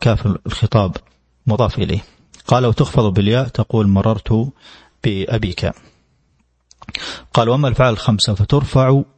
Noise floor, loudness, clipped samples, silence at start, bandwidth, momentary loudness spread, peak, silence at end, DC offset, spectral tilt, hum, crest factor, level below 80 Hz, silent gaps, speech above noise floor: -61 dBFS; -17 LUFS; under 0.1%; 0 s; 8.8 kHz; 11 LU; 0 dBFS; 0.15 s; under 0.1%; -7 dB/octave; none; 16 dB; -36 dBFS; none; 45 dB